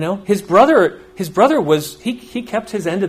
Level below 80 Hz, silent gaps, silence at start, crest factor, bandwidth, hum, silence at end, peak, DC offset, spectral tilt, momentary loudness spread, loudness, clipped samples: -52 dBFS; none; 0 s; 16 dB; 15.5 kHz; none; 0 s; 0 dBFS; under 0.1%; -5.5 dB/octave; 13 LU; -16 LUFS; under 0.1%